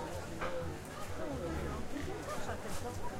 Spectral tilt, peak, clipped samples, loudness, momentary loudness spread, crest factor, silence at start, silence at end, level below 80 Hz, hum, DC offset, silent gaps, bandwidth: -5 dB/octave; -26 dBFS; under 0.1%; -41 LUFS; 3 LU; 12 dB; 0 s; 0 s; -48 dBFS; none; under 0.1%; none; 16 kHz